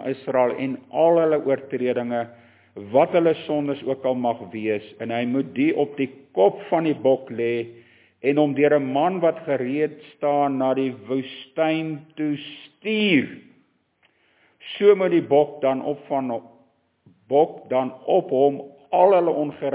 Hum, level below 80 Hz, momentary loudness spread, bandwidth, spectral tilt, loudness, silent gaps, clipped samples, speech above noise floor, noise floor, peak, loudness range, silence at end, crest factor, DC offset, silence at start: none; -72 dBFS; 11 LU; 4 kHz; -10 dB/octave; -22 LUFS; none; under 0.1%; 43 dB; -65 dBFS; -4 dBFS; 3 LU; 0 s; 18 dB; under 0.1%; 0 s